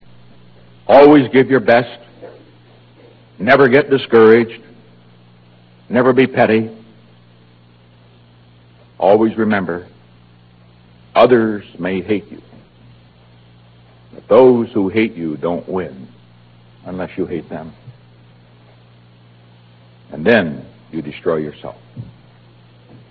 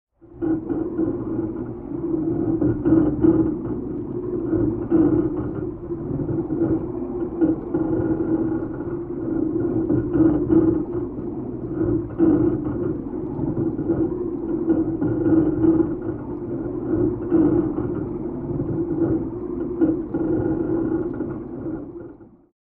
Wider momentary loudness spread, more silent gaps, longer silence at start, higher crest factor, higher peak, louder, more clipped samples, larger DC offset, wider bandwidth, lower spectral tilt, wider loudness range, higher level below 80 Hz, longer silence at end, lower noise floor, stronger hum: first, 22 LU vs 11 LU; neither; first, 0.9 s vs 0.25 s; about the same, 16 dB vs 16 dB; first, 0 dBFS vs -6 dBFS; first, -14 LUFS vs -23 LUFS; first, 0.1% vs under 0.1%; second, under 0.1% vs 0.1%; first, 5.4 kHz vs 2.4 kHz; second, -9 dB/octave vs -14 dB/octave; first, 12 LU vs 3 LU; second, -54 dBFS vs -40 dBFS; first, 1.05 s vs 0.35 s; first, -47 dBFS vs -43 dBFS; first, 60 Hz at -55 dBFS vs none